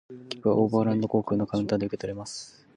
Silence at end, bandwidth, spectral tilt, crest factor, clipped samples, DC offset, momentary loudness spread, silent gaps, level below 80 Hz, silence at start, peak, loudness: 0.25 s; 10.5 kHz; -7 dB/octave; 16 dB; under 0.1%; under 0.1%; 14 LU; none; -60 dBFS; 0.1 s; -10 dBFS; -27 LUFS